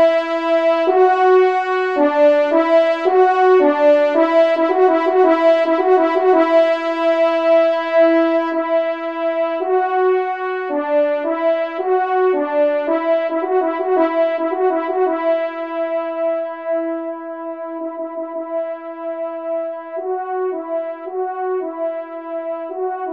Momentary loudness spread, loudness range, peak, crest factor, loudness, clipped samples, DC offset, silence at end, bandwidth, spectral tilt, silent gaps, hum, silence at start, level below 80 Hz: 12 LU; 10 LU; -2 dBFS; 14 dB; -17 LUFS; under 0.1%; 0.2%; 0 s; 7 kHz; -4 dB/octave; none; none; 0 s; -72 dBFS